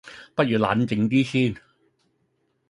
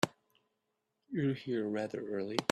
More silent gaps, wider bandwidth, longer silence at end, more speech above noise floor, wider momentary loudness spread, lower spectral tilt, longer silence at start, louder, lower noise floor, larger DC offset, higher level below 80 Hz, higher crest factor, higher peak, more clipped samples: neither; second, 11 kHz vs 13 kHz; first, 1.1 s vs 0.05 s; about the same, 49 dB vs 49 dB; first, 8 LU vs 4 LU; first, -7 dB/octave vs -5 dB/octave; about the same, 0.05 s vs 0 s; first, -23 LUFS vs -36 LUFS; second, -70 dBFS vs -84 dBFS; neither; first, -58 dBFS vs -78 dBFS; second, 20 dB vs 26 dB; first, -6 dBFS vs -12 dBFS; neither